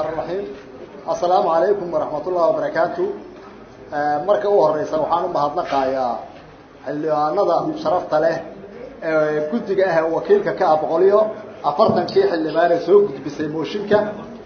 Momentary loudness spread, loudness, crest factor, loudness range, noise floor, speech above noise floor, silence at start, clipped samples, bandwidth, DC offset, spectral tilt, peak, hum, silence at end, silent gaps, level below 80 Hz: 14 LU; -19 LUFS; 18 dB; 4 LU; -42 dBFS; 24 dB; 0 s; under 0.1%; 6.6 kHz; under 0.1%; -4.5 dB/octave; -2 dBFS; none; 0 s; none; -56 dBFS